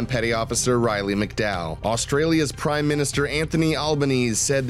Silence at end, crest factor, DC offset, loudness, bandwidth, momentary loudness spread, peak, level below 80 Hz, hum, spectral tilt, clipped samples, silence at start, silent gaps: 0 s; 14 dB; under 0.1%; -22 LUFS; 15.5 kHz; 4 LU; -8 dBFS; -40 dBFS; none; -4.5 dB/octave; under 0.1%; 0 s; none